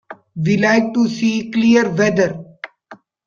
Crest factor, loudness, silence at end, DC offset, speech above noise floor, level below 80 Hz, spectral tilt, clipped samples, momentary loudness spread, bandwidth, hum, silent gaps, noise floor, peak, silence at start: 14 dB; -16 LUFS; 0.3 s; under 0.1%; 29 dB; -56 dBFS; -6 dB/octave; under 0.1%; 20 LU; 7.2 kHz; none; none; -44 dBFS; -2 dBFS; 0.1 s